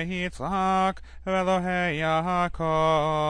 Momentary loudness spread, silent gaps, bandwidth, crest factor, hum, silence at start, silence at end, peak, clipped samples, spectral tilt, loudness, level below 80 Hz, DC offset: 6 LU; none; 10.5 kHz; 12 dB; none; 0 s; 0 s; -12 dBFS; under 0.1%; -6 dB/octave; -25 LUFS; -44 dBFS; under 0.1%